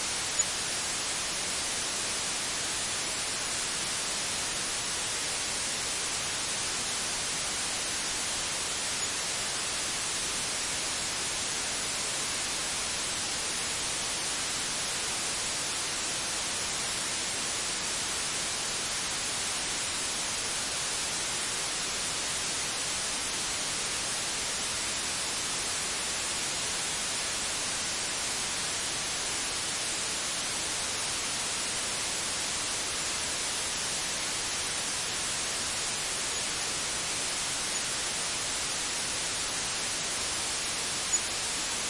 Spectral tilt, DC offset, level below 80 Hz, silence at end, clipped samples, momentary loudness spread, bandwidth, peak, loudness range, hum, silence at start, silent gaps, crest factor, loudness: 0 dB/octave; under 0.1%; -56 dBFS; 0 s; under 0.1%; 0 LU; 11.5 kHz; -16 dBFS; 0 LU; none; 0 s; none; 16 dB; -29 LUFS